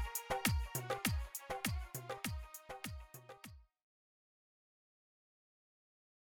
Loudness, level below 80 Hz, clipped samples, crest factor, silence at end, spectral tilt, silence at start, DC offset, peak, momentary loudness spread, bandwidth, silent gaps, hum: -41 LUFS; -50 dBFS; under 0.1%; 22 dB; 2.6 s; -4 dB/octave; 0 s; under 0.1%; -22 dBFS; 18 LU; 19 kHz; none; none